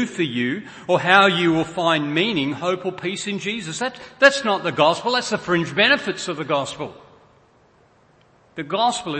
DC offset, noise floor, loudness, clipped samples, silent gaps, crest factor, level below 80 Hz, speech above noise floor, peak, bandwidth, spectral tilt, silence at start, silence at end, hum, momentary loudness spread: under 0.1%; -56 dBFS; -20 LUFS; under 0.1%; none; 22 dB; -62 dBFS; 35 dB; 0 dBFS; 8.8 kHz; -4 dB/octave; 0 s; 0 s; none; 12 LU